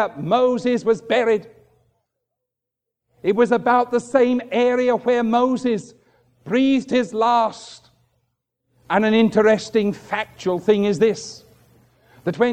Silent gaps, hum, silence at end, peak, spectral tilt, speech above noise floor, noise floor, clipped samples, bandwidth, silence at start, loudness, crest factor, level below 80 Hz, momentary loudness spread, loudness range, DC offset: none; none; 0 s; -2 dBFS; -5.5 dB/octave; 65 dB; -84 dBFS; under 0.1%; 9.6 kHz; 0 s; -19 LUFS; 18 dB; -62 dBFS; 10 LU; 3 LU; under 0.1%